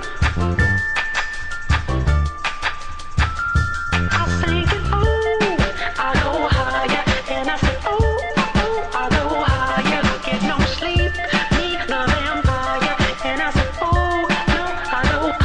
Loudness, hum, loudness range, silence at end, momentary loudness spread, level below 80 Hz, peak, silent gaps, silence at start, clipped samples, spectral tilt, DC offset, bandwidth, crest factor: -19 LUFS; none; 2 LU; 0 s; 4 LU; -26 dBFS; -6 dBFS; none; 0 s; under 0.1%; -5.5 dB/octave; under 0.1%; 10 kHz; 14 dB